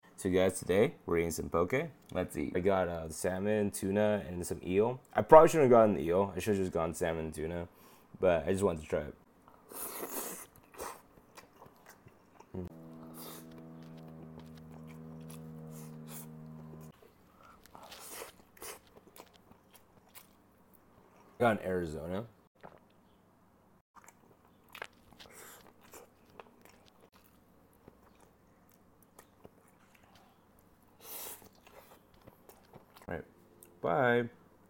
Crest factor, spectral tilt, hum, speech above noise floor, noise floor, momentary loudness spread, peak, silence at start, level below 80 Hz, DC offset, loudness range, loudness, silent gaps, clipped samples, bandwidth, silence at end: 30 dB; -5.5 dB/octave; none; 36 dB; -66 dBFS; 22 LU; -6 dBFS; 0.2 s; -60 dBFS; under 0.1%; 26 LU; -31 LUFS; 22.47-22.55 s, 23.81-23.94 s; under 0.1%; 17 kHz; 0.4 s